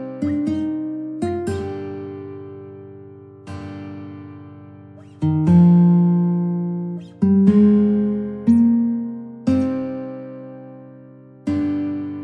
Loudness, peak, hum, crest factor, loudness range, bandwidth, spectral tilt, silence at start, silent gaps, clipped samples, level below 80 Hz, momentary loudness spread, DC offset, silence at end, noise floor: -19 LUFS; -4 dBFS; none; 16 dB; 15 LU; 5.4 kHz; -10 dB/octave; 0 s; none; under 0.1%; -54 dBFS; 23 LU; under 0.1%; 0 s; -43 dBFS